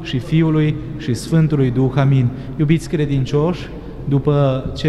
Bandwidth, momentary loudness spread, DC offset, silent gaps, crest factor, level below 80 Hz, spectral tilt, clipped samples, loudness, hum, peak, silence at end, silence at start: 12 kHz; 8 LU; under 0.1%; none; 14 dB; -36 dBFS; -8 dB/octave; under 0.1%; -17 LUFS; none; -4 dBFS; 0 s; 0 s